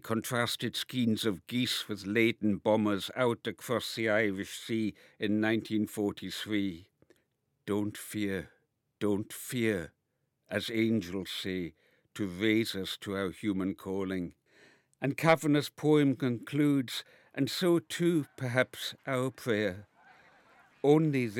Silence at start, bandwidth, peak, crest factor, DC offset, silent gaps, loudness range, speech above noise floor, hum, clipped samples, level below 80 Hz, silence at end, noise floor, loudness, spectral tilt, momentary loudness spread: 0.05 s; 17 kHz; -8 dBFS; 22 dB; under 0.1%; none; 6 LU; 49 dB; none; under 0.1%; -74 dBFS; 0 s; -80 dBFS; -31 LUFS; -5.5 dB/octave; 11 LU